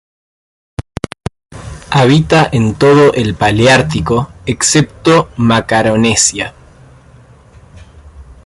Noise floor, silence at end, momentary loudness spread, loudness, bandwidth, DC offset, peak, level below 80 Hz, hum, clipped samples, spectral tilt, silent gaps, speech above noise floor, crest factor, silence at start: -41 dBFS; 0.15 s; 18 LU; -10 LUFS; 11.5 kHz; under 0.1%; 0 dBFS; -36 dBFS; none; under 0.1%; -4.5 dB/octave; none; 31 dB; 12 dB; 0.8 s